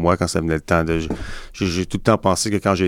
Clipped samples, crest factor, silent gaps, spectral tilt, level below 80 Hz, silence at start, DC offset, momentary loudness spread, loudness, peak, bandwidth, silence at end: under 0.1%; 18 dB; none; -5 dB/octave; -36 dBFS; 0 s; under 0.1%; 9 LU; -20 LUFS; -2 dBFS; 16.5 kHz; 0 s